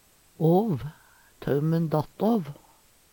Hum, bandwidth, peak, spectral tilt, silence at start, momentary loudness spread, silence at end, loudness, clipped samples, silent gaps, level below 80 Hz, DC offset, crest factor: none; 18 kHz; -10 dBFS; -9 dB/octave; 0.4 s; 14 LU; 0.6 s; -26 LUFS; under 0.1%; none; -58 dBFS; under 0.1%; 16 dB